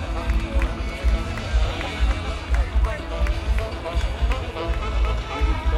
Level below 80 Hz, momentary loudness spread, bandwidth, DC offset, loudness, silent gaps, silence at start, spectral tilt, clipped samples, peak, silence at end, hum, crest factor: -24 dBFS; 3 LU; 10.5 kHz; under 0.1%; -25 LUFS; none; 0 s; -6 dB/octave; under 0.1%; -10 dBFS; 0 s; none; 14 dB